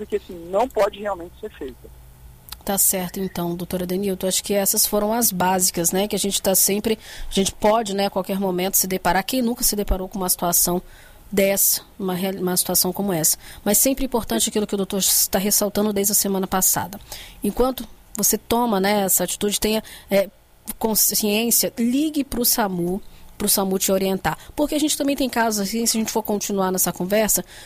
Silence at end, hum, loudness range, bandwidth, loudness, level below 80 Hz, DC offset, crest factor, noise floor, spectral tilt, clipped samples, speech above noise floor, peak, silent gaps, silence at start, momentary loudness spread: 0 s; none; 2 LU; 16 kHz; -20 LUFS; -40 dBFS; under 0.1%; 16 dB; -44 dBFS; -3 dB/octave; under 0.1%; 23 dB; -4 dBFS; none; 0 s; 10 LU